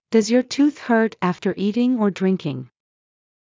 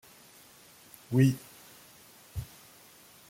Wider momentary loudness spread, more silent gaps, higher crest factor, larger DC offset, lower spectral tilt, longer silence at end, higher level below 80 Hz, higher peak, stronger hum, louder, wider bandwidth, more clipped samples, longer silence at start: second, 6 LU vs 27 LU; neither; second, 16 dB vs 22 dB; neither; about the same, -6 dB/octave vs -7 dB/octave; about the same, 0.9 s vs 0.85 s; second, -68 dBFS vs -58 dBFS; first, -4 dBFS vs -12 dBFS; neither; first, -20 LUFS vs -30 LUFS; second, 7.6 kHz vs 16.5 kHz; neither; second, 0.1 s vs 1.1 s